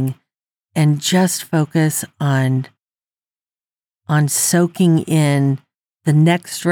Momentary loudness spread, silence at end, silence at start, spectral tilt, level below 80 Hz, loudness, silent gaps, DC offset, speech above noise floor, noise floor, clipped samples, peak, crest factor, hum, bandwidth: 10 LU; 0 s; 0 s; -5.5 dB/octave; -78 dBFS; -17 LUFS; 3.13-3.17 s, 3.27-3.31 s; under 0.1%; over 75 dB; under -90 dBFS; under 0.1%; -4 dBFS; 14 dB; none; 18 kHz